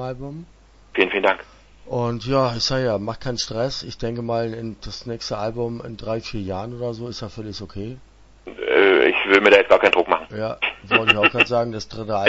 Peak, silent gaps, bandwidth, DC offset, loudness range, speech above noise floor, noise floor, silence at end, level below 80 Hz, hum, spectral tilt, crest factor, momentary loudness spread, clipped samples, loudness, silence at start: 0 dBFS; none; 8 kHz; under 0.1%; 12 LU; 20 dB; -42 dBFS; 0 s; -46 dBFS; none; -4.5 dB/octave; 22 dB; 17 LU; under 0.1%; -20 LUFS; 0 s